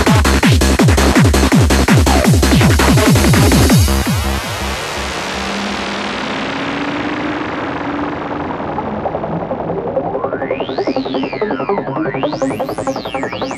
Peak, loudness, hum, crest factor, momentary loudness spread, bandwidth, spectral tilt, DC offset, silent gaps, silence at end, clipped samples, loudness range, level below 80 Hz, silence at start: 0 dBFS; -15 LUFS; none; 14 dB; 10 LU; 14 kHz; -5 dB/octave; under 0.1%; none; 0 s; under 0.1%; 9 LU; -22 dBFS; 0 s